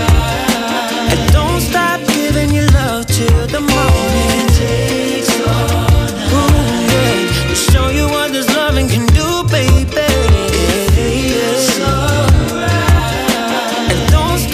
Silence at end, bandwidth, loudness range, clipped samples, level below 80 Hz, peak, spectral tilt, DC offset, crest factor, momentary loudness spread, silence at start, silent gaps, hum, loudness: 0 s; 16 kHz; 1 LU; under 0.1%; -18 dBFS; 0 dBFS; -5 dB/octave; under 0.1%; 12 dB; 3 LU; 0 s; none; none; -13 LUFS